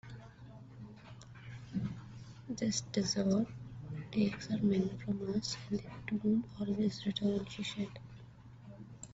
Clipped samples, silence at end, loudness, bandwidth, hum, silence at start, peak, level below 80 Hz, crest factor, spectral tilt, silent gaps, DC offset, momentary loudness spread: under 0.1%; 0 s; -36 LUFS; 8 kHz; none; 0.05 s; -20 dBFS; -62 dBFS; 16 dB; -6 dB/octave; none; under 0.1%; 20 LU